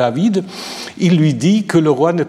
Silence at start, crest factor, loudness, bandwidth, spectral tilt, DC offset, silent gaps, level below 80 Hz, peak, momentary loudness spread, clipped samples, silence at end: 0 s; 12 dB; -14 LUFS; 13 kHz; -6.5 dB/octave; under 0.1%; none; -60 dBFS; -2 dBFS; 13 LU; under 0.1%; 0 s